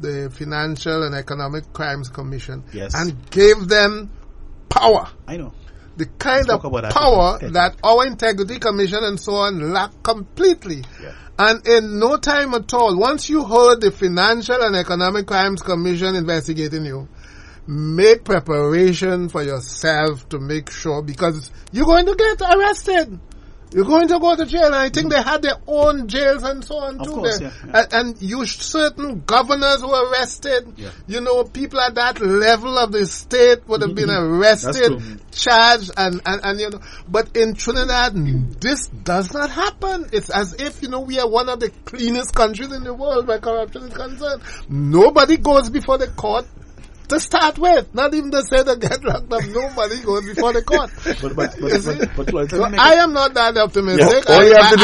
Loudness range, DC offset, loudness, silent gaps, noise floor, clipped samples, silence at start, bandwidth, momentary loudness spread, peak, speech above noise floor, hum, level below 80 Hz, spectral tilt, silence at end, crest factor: 5 LU; under 0.1%; -17 LUFS; none; -39 dBFS; under 0.1%; 0 s; 11.5 kHz; 13 LU; 0 dBFS; 22 dB; none; -34 dBFS; -4.5 dB/octave; 0 s; 16 dB